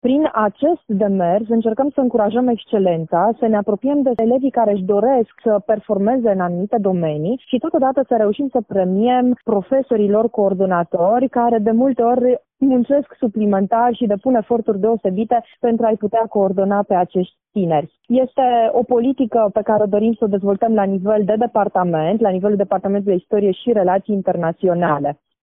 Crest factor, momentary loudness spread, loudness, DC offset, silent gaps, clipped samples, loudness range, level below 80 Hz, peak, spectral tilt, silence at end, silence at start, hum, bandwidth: 14 dB; 4 LU; -17 LUFS; under 0.1%; none; under 0.1%; 2 LU; -58 dBFS; -2 dBFS; -7 dB/octave; 0.3 s; 0.05 s; none; 3.8 kHz